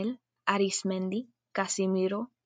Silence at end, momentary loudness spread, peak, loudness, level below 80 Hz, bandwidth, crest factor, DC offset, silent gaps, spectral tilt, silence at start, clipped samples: 0.2 s; 8 LU; -8 dBFS; -31 LUFS; -82 dBFS; 9.6 kHz; 22 dB; under 0.1%; none; -4.5 dB/octave; 0 s; under 0.1%